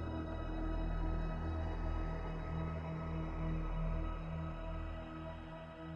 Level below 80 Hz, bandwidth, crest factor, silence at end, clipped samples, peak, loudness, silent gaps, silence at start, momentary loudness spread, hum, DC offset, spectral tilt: -42 dBFS; 6.4 kHz; 12 dB; 0 s; under 0.1%; -28 dBFS; -43 LUFS; none; 0 s; 6 LU; none; under 0.1%; -8.5 dB/octave